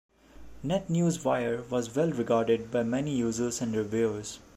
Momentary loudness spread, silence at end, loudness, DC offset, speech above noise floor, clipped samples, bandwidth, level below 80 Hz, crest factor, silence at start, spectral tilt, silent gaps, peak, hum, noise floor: 5 LU; 0.2 s; -29 LUFS; under 0.1%; 20 dB; under 0.1%; 15 kHz; -58 dBFS; 16 dB; 0.35 s; -6 dB/octave; none; -12 dBFS; none; -49 dBFS